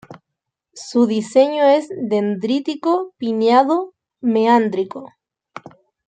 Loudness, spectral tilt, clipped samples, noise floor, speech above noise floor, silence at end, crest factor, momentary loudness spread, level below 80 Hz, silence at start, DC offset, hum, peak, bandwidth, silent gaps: -17 LUFS; -6 dB/octave; under 0.1%; -81 dBFS; 64 dB; 0.4 s; 16 dB; 20 LU; -70 dBFS; 0.1 s; under 0.1%; none; -2 dBFS; 9.2 kHz; none